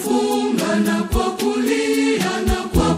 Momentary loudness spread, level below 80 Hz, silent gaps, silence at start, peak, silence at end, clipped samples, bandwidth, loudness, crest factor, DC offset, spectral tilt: 2 LU; -30 dBFS; none; 0 s; -4 dBFS; 0 s; under 0.1%; 16 kHz; -19 LUFS; 14 dB; under 0.1%; -5 dB/octave